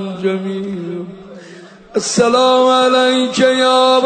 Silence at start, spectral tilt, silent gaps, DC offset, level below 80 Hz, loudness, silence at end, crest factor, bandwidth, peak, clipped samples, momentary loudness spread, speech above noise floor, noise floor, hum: 0 s; -3.5 dB/octave; none; under 0.1%; -58 dBFS; -13 LUFS; 0 s; 12 dB; 9.4 kHz; -2 dBFS; under 0.1%; 13 LU; 24 dB; -37 dBFS; none